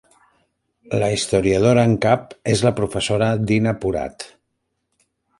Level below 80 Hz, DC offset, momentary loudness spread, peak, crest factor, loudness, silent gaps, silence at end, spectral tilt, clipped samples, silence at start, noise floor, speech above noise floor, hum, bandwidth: -46 dBFS; under 0.1%; 11 LU; -2 dBFS; 18 dB; -19 LUFS; none; 1.1 s; -5.5 dB/octave; under 0.1%; 0.9 s; -74 dBFS; 56 dB; none; 11.5 kHz